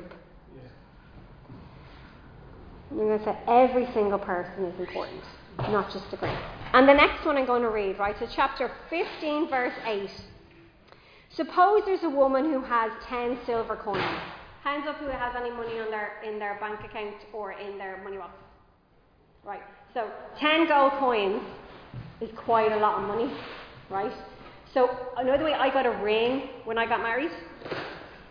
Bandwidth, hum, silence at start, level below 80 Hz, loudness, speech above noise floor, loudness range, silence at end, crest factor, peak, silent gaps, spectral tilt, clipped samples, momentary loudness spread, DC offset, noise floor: 5.2 kHz; none; 0 s; -54 dBFS; -27 LUFS; 35 dB; 11 LU; 0 s; 24 dB; -4 dBFS; none; -7 dB/octave; under 0.1%; 19 LU; under 0.1%; -61 dBFS